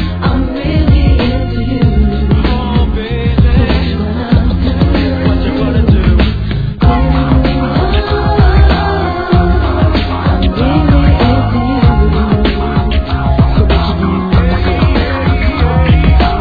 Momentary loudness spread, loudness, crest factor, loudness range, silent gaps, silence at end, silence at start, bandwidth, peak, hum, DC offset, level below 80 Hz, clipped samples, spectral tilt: 4 LU; -11 LUFS; 10 dB; 1 LU; none; 0 s; 0 s; 5 kHz; 0 dBFS; none; under 0.1%; -14 dBFS; 0.2%; -9.5 dB/octave